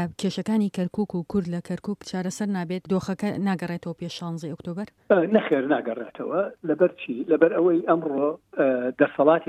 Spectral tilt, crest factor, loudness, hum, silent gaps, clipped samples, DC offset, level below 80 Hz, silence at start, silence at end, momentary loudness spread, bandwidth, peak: -7 dB/octave; 20 dB; -25 LUFS; none; none; under 0.1%; under 0.1%; -62 dBFS; 0 s; 0.05 s; 12 LU; 13 kHz; -4 dBFS